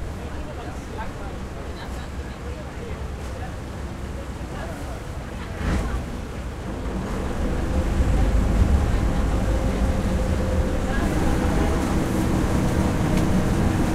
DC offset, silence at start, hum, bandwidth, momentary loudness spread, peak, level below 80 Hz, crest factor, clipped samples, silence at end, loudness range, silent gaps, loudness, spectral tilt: under 0.1%; 0 s; none; 15 kHz; 12 LU; -6 dBFS; -26 dBFS; 16 dB; under 0.1%; 0 s; 10 LU; none; -25 LUFS; -6.5 dB/octave